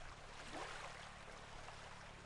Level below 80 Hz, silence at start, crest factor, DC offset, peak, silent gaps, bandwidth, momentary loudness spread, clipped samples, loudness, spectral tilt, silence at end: -62 dBFS; 0 s; 18 dB; under 0.1%; -34 dBFS; none; 11.5 kHz; 6 LU; under 0.1%; -53 LUFS; -3 dB/octave; 0 s